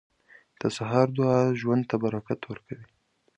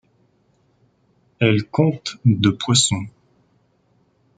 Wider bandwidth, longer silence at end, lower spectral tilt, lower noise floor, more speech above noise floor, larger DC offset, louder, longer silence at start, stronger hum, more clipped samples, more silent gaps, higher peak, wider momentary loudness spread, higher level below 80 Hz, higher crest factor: about the same, 10.5 kHz vs 9.6 kHz; second, 0.55 s vs 1.3 s; first, -7.5 dB/octave vs -4.5 dB/octave; second, -58 dBFS vs -62 dBFS; second, 32 dB vs 44 dB; neither; second, -26 LUFS vs -18 LUFS; second, 0.6 s vs 1.4 s; neither; neither; neither; second, -6 dBFS vs -2 dBFS; first, 16 LU vs 5 LU; second, -64 dBFS vs -58 dBFS; about the same, 20 dB vs 20 dB